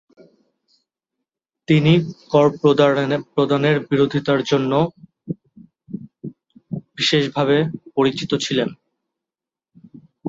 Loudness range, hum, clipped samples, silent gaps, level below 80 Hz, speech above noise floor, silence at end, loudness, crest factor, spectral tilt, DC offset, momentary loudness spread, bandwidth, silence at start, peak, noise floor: 5 LU; none; under 0.1%; none; -58 dBFS; 71 dB; 0 s; -18 LUFS; 18 dB; -6 dB/octave; under 0.1%; 18 LU; 7.8 kHz; 1.7 s; -2 dBFS; -89 dBFS